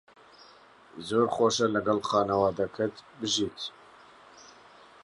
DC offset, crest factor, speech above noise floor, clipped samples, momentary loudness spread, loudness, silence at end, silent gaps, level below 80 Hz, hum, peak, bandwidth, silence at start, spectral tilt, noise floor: under 0.1%; 18 dB; 28 dB; under 0.1%; 14 LU; -28 LUFS; 0.55 s; none; -62 dBFS; none; -12 dBFS; 11.5 kHz; 0.95 s; -4 dB/octave; -55 dBFS